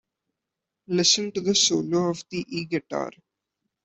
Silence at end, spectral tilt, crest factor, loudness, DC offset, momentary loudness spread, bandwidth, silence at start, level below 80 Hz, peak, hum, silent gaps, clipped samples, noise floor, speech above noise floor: 0.75 s; -3 dB/octave; 20 dB; -23 LUFS; under 0.1%; 12 LU; 8.4 kHz; 0.9 s; -66 dBFS; -6 dBFS; none; none; under 0.1%; -85 dBFS; 61 dB